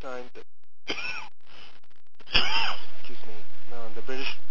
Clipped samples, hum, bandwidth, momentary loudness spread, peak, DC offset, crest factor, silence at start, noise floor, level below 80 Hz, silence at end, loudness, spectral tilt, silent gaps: under 0.1%; none; 7.6 kHz; 25 LU; -4 dBFS; under 0.1%; 16 dB; 0 s; -53 dBFS; -50 dBFS; 0 s; -29 LUFS; -3.5 dB/octave; none